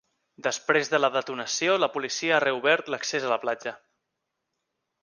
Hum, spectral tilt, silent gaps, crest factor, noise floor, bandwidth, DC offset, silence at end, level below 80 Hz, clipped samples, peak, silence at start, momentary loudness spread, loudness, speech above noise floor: none; -2.5 dB/octave; none; 22 dB; -82 dBFS; 10.5 kHz; under 0.1%; 1.25 s; -80 dBFS; under 0.1%; -6 dBFS; 0.4 s; 8 LU; -25 LUFS; 56 dB